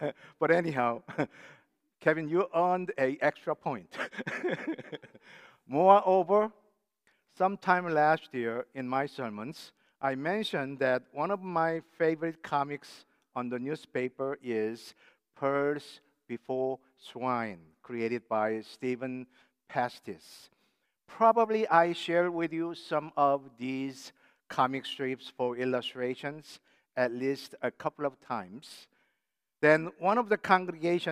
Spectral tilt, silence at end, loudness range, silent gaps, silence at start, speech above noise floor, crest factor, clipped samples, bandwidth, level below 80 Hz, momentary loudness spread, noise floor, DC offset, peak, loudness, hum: -6 dB/octave; 0 s; 7 LU; none; 0 s; 55 dB; 24 dB; under 0.1%; 15 kHz; -84 dBFS; 15 LU; -85 dBFS; under 0.1%; -6 dBFS; -31 LUFS; none